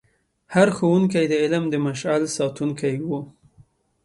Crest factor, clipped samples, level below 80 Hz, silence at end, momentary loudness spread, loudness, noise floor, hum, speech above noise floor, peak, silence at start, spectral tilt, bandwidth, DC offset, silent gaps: 18 dB; under 0.1%; -62 dBFS; 0.75 s; 9 LU; -22 LUFS; -56 dBFS; none; 35 dB; -4 dBFS; 0.5 s; -6 dB/octave; 11.5 kHz; under 0.1%; none